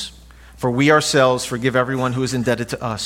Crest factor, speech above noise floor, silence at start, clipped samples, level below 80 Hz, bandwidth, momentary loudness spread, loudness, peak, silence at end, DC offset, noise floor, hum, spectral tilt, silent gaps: 18 dB; 25 dB; 0 s; under 0.1%; -46 dBFS; 16.5 kHz; 10 LU; -18 LUFS; -2 dBFS; 0 s; under 0.1%; -43 dBFS; none; -4.5 dB/octave; none